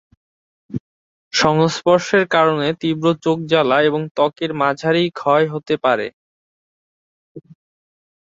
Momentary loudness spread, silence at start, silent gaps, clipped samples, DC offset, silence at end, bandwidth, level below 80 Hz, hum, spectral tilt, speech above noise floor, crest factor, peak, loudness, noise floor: 7 LU; 0.7 s; 0.80-1.31 s, 4.11-4.15 s, 6.13-7.35 s; under 0.1%; under 0.1%; 0.85 s; 7.8 kHz; -58 dBFS; none; -5 dB/octave; over 73 dB; 18 dB; -2 dBFS; -17 LUFS; under -90 dBFS